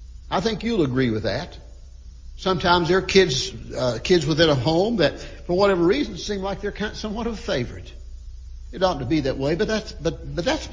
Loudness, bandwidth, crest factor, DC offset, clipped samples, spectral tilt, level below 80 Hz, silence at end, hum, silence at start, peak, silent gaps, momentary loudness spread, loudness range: -22 LUFS; 7.6 kHz; 20 dB; under 0.1%; under 0.1%; -5 dB/octave; -38 dBFS; 0 s; none; 0 s; -4 dBFS; none; 16 LU; 6 LU